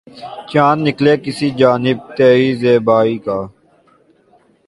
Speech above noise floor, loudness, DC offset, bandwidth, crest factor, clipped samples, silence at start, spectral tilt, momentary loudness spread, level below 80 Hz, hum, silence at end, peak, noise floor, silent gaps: 39 dB; -14 LUFS; under 0.1%; 11.5 kHz; 14 dB; under 0.1%; 0.15 s; -7 dB/octave; 11 LU; -54 dBFS; none; 1.2 s; 0 dBFS; -53 dBFS; none